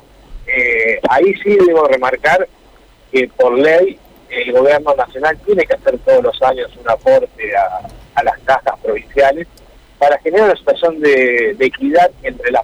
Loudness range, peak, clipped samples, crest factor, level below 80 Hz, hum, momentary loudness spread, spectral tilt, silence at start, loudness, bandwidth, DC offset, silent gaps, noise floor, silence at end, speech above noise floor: 3 LU; -4 dBFS; under 0.1%; 10 dB; -42 dBFS; none; 8 LU; -5.5 dB/octave; 0.3 s; -13 LUFS; 11 kHz; under 0.1%; none; -45 dBFS; 0 s; 32 dB